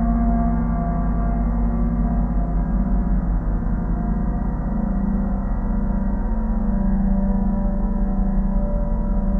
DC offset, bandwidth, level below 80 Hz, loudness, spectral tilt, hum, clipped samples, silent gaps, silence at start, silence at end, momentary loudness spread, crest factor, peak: under 0.1%; 2.2 kHz; -22 dBFS; -23 LUFS; -12.5 dB/octave; 50 Hz at -25 dBFS; under 0.1%; none; 0 s; 0 s; 3 LU; 12 dB; -8 dBFS